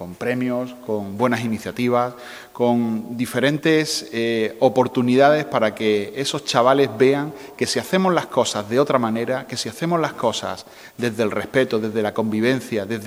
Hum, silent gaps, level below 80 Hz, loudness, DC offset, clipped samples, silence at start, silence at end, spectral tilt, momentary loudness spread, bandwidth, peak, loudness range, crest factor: none; none; -64 dBFS; -20 LUFS; under 0.1%; under 0.1%; 0 s; 0 s; -5 dB/octave; 10 LU; 16 kHz; 0 dBFS; 4 LU; 20 dB